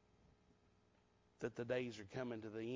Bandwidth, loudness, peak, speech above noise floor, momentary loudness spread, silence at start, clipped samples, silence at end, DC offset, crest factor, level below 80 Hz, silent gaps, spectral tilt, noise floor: 7.6 kHz; -46 LUFS; -30 dBFS; 30 dB; 6 LU; 1.4 s; under 0.1%; 0 s; under 0.1%; 20 dB; -78 dBFS; none; -6 dB/octave; -75 dBFS